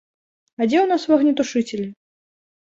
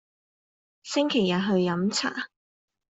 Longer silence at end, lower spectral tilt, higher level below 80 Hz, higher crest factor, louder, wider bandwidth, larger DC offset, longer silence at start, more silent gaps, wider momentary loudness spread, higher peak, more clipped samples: first, 0.85 s vs 0.65 s; about the same, -5 dB/octave vs -5 dB/octave; about the same, -66 dBFS vs -68 dBFS; about the same, 18 dB vs 16 dB; first, -19 LUFS vs -26 LUFS; about the same, 7.8 kHz vs 8.2 kHz; neither; second, 0.6 s vs 0.85 s; neither; about the same, 11 LU vs 13 LU; first, -4 dBFS vs -12 dBFS; neither